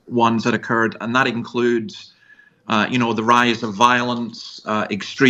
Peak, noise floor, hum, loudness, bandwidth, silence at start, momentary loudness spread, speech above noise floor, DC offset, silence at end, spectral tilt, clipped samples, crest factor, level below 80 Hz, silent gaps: 0 dBFS; -51 dBFS; none; -19 LUFS; 9.2 kHz; 0.1 s; 13 LU; 33 dB; under 0.1%; 0 s; -5 dB/octave; under 0.1%; 18 dB; -64 dBFS; none